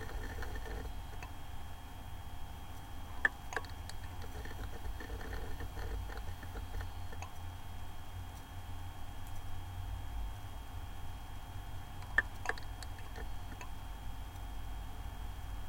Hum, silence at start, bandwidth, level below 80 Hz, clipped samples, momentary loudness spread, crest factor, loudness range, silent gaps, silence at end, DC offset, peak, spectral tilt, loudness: none; 0 s; 16 kHz; -46 dBFS; under 0.1%; 11 LU; 28 dB; 6 LU; none; 0 s; under 0.1%; -14 dBFS; -4.5 dB/octave; -44 LUFS